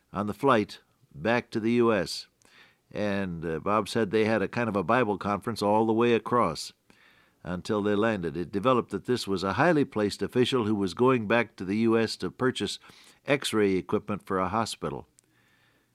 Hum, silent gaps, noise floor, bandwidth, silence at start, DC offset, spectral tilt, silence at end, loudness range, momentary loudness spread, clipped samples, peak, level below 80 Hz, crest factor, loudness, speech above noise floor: none; none; -66 dBFS; 14.5 kHz; 0.15 s; under 0.1%; -5.5 dB/octave; 0.95 s; 3 LU; 10 LU; under 0.1%; -8 dBFS; -64 dBFS; 20 dB; -27 LUFS; 39 dB